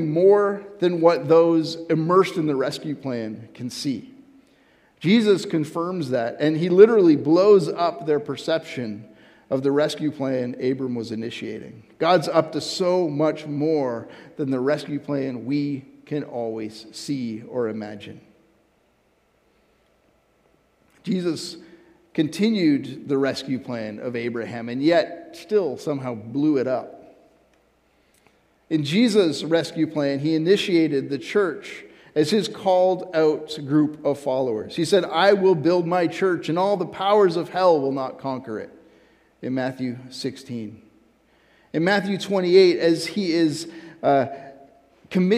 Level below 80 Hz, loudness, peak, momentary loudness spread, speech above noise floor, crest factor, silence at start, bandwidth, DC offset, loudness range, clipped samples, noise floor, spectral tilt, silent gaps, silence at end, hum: -70 dBFS; -22 LUFS; 0 dBFS; 14 LU; 42 dB; 22 dB; 0 s; 13.5 kHz; under 0.1%; 12 LU; under 0.1%; -64 dBFS; -6 dB/octave; none; 0 s; none